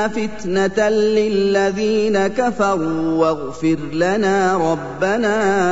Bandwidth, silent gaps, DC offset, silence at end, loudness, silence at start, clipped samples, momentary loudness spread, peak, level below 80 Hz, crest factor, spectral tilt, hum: 8 kHz; none; 1%; 0 s; -18 LUFS; 0 s; under 0.1%; 4 LU; -4 dBFS; -46 dBFS; 14 dB; -5.5 dB/octave; none